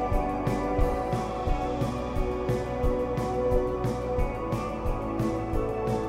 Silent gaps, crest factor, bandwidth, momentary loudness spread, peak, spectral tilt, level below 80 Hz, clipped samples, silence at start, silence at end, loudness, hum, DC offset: none; 16 dB; 15.5 kHz; 4 LU; -10 dBFS; -7.5 dB/octave; -34 dBFS; under 0.1%; 0 s; 0 s; -29 LUFS; none; under 0.1%